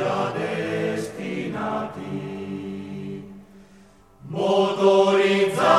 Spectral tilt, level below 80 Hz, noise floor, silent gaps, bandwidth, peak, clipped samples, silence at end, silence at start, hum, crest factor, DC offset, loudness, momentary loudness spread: -5.5 dB/octave; -62 dBFS; -52 dBFS; none; 13 kHz; -6 dBFS; under 0.1%; 0 s; 0 s; none; 18 dB; under 0.1%; -23 LUFS; 16 LU